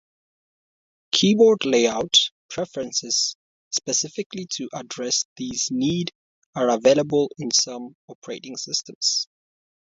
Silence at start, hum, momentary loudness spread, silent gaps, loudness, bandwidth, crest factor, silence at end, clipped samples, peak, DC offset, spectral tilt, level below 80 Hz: 1.15 s; none; 15 LU; 2.32-2.49 s, 3.35-3.71 s, 4.26-4.30 s, 5.25-5.36 s, 6.15-6.53 s, 7.95-8.08 s, 8.15-8.22 s, 8.95-9.01 s; -22 LUFS; 7.8 kHz; 20 dB; 0.55 s; under 0.1%; -4 dBFS; under 0.1%; -3 dB/octave; -64 dBFS